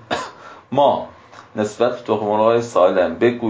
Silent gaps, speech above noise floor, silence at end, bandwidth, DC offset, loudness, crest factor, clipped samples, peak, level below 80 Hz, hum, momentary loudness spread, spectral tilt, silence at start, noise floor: none; 20 dB; 0 s; 8 kHz; under 0.1%; -18 LUFS; 16 dB; under 0.1%; -2 dBFS; -56 dBFS; none; 11 LU; -6 dB/octave; 0.1 s; -37 dBFS